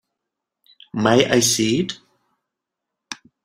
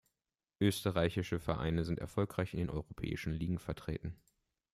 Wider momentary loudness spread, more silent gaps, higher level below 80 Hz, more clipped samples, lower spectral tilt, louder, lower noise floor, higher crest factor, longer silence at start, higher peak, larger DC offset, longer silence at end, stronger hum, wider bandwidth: first, 21 LU vs 8 LU; neither; about the same, -56 dBFS vs -54 dBFS; neither; second, -3.5 dB/octave vs -6.5 dB/octave; first, -18 LUFS vs -37 LUFS; second, -83 dBFS vs under -90 dBFS; about the same, 22 dB vs 20 dB; first, 0.95 s vs 0.6 s; first, -2 dBFS vs -18 dBFS; neither; second, 0.3 s vs 0.6 s; neither; about the same, 16 kHz vs 15.5 kHz